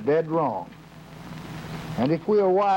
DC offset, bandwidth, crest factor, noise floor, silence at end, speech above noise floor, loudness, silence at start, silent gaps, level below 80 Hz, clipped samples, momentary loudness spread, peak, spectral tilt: under 0.1%; 16.5 kHz; 12 dB; -43 dBFS; 0 s; 21 dB; -24 LUFS; 0 s; none; -54 dBFS; under 0.1%; 22 LU; -12 dBFS; -7.5 dB/octave